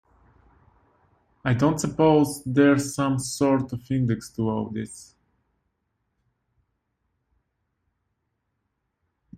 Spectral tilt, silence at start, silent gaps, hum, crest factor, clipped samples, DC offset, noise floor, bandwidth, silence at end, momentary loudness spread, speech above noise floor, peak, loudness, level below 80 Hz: -6 dB/octave; 1.45 s; none; none; 20 dB; under 0.1%; under 0.1%; -77 dBFS; 15 kHz; 4.35 s; 12 LU; 55 dB; -6 dBFS; -23 LUFS; -58 dBFS